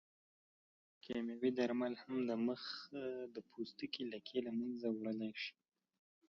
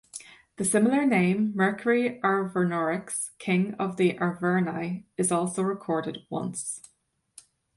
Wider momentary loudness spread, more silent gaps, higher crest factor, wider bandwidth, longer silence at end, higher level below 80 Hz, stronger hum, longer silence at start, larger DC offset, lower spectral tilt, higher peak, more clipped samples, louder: about the same, 9 LU vs 11 LU; neither; about the same, 18 dB vs 16 dB; second, 6.8 kHz vs 11.5 kHz; second, 0.8 s vs 0.95 s; second, -82 dBFS vs -70 dBFS; neither; first, 1.05 s vs 0.15 s; neither; second, -4 dB/octave vs -5.5 dB/octave; second, -26 dBFS vs -10 dBFS; neither; second, -43 LUFS vs -26 LUFS